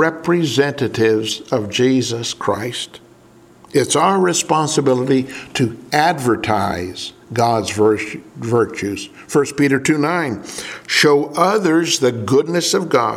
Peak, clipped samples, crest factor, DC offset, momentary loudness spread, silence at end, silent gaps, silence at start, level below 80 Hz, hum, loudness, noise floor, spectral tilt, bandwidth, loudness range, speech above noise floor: 0 dBFS; under 0.1%; 18 dB; under 0.1%; 10 LU; 0 s; none; 0 s; -56 dBFS; none; -17 LUFS; -46 dBFS; -4.5 dB/octave; 16 kHz; 3 LU; 30 dB